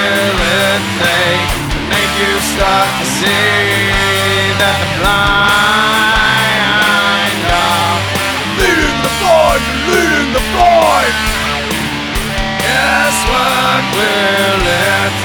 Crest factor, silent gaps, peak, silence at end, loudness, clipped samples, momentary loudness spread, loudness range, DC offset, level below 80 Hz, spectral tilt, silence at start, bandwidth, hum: 12 dB; none; 0 dBFS; 0 s; -11 LUFS; under 0.1%; 5 LU; 2 LU; under 0.1%; -26 dBFS; -3 dB/octave; 0 s; over 20 kHz; none